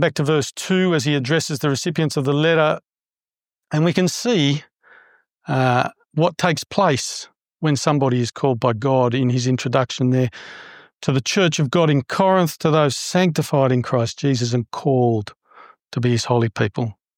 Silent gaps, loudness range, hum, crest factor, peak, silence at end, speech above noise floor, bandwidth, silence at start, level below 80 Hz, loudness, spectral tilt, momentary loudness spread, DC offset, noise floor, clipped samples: none; 3 LU; none; 18 dB; -2 dBFS; 0.25 s; over 71 dB; 16.5 kHz; 0 s; -62 dBFS; -19 LUFS; -5.5 dB/octave; 8 LU; under 0.1%; under -90 dBFS; under 0.1%